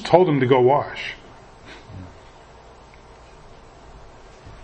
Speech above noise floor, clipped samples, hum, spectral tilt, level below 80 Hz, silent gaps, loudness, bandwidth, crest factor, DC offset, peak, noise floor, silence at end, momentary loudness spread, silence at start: 29 dB; under 0.1%; none; -7 dB/octave; -50 dBFS; none; -18 LUFS; 8.6 kHz; 22 dB; under 0.1%; 0 dBFS; -46 dBFS; 0.1 s; 26 LU; 0 s